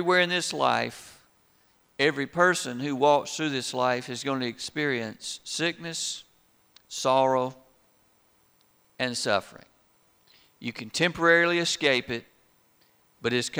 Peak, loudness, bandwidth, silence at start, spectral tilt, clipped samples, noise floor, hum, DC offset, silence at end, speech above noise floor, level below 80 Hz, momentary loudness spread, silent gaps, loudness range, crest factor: -6 dBFS; -26 LUFS; over 20 kHz; 0 s; -3.5 dB/octave; under 0.1%; -64 dBFS; none; under 0.1%; 0 s; 38 dB; -68 dBFS; 13 LU; none; 5 LU; 22 dB